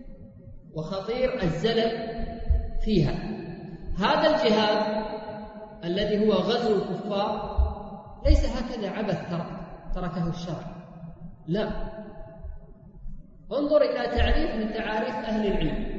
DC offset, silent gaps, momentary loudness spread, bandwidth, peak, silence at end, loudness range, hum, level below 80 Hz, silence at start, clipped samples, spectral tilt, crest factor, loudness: under 0.1%; none; 20 LU; 7.8 kHz; -4 dBFS; 0 s; 9 LU; none; -32 dBFS; 0 s; under 0.1%; -7 dB/octave; 22 dB; -27 LUFS